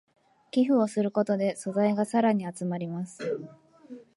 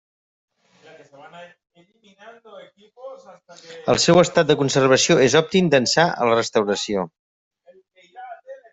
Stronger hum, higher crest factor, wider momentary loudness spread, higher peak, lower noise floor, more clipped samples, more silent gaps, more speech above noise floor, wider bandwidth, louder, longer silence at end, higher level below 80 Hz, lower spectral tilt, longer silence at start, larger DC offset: neither; about the same, 16 dB vs 20 dB; second, 11 LU vs 25 LU; second, -12 dBFS vs -2 dBFS; second, -48 dBFS vs -53 dBFS; neither; second, none vs 7.19-7.51 s; second, 22 dB vs 34 dB; first, 11.5 kHz vs 8.2 kHz; second, -28 LUFS vs -17 LUFS; about the same, 0.15 s vs 0.15 s; second, -76 dBFS vs -60 dBFS; first, -6.5 dB/octave vs -4 dB/octave; second, 0.55 s vs 1.25 s; neither